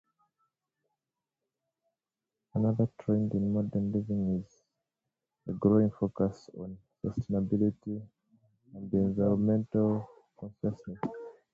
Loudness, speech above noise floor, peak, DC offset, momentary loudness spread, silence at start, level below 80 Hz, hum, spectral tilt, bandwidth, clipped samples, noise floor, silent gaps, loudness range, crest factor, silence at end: -31 LUFS; 60 dB; -12 dBFS; under 0.1%; 18 LU; 2.55 s; -58 dBFS; none; -11 dB/octave; 7 kHz; under 0.1%; -90 dBFS; none; 3 LU; 20 dB; 0.2 s